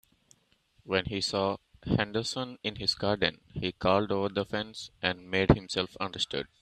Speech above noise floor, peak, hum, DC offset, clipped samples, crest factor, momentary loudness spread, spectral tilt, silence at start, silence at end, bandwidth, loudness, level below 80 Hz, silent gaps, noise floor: 38 dB; -4 dBFS; none; under 0.1%; under 0.1%; 26 dB; 8 LU; -5 dB/octave; 0.85 s; 0.15 s; 14 kHz; -30 LUFS; -48 dBFS; none; -68 dBFS